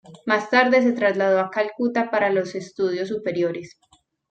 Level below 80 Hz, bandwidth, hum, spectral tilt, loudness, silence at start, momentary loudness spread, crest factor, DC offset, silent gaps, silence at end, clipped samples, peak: -70 dBFS; 8.6 kHz; none; -5.5 dB/octave; -21 LUFS; 0.1 s; 8 LU; 18 dB; under 0.1%; none; 0.65 s; under 0.1%; -4 dBFS